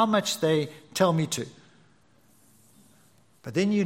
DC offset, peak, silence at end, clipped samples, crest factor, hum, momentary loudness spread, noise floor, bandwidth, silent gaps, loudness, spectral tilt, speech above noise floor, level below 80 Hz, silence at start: under 0.1%; -8 dBFS; 0 s; under 0.1%; 20 dB; none; 11 LU; -62 dBFS; 16.5 kHz; none; -26 LUFS; -5 dB/octave; 37 dB; -70 dBFS; 0 s